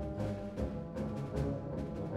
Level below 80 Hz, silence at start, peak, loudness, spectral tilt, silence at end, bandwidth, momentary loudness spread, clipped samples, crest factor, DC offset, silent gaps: -48 dBFS; 0 s; -22 dBFS; -39 LUFS; -8.5 dB/octave; 0 s; 12.5 kHz; 3 LU; under 0.1%; 16 dB; under 0.1%; none